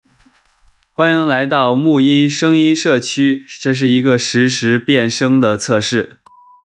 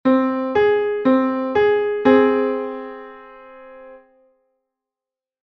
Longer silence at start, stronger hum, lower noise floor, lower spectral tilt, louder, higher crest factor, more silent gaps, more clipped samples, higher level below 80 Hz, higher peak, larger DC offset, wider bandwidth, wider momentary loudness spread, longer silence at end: first, 1 s vs 0.05 s; neither; second, -54 dBFS vs -89 dBFS; second, -5 dB/octave vs -7.5 dB/octave; first, -13 LUFS vs -18 LUFS; about the same, 14 dB vs 18 dB; neither; neither; second, -62 dBFS vs -56 dBFS; about the same, 0 dBFS vs -2 dBFS; neither; first, 10.5 kHz vs 5.8 kHz; second, 5 LU vs 17 LU; second, 0.6 s vs 1.45 s